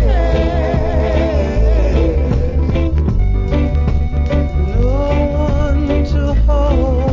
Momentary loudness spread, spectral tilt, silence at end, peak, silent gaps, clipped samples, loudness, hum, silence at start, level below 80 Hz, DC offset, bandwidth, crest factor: 2 LU; -8.5 dB/octave; 0 s; -2 dBFS; none; under 0.1%; -16 LUFS; none; 0 s; -14 dBFS; under 0.1%; 7.2 kHz; 12 dB